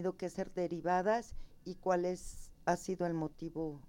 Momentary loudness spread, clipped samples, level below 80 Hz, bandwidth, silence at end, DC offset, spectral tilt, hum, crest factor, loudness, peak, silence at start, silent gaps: 14 LU; under 0.1%; -54 dBFS; 16.5 kHz; 0 s; under 0.1%; -6 dB/octave; none; 18 dB; -37 LUFS; -20 dBFS; 0 s; none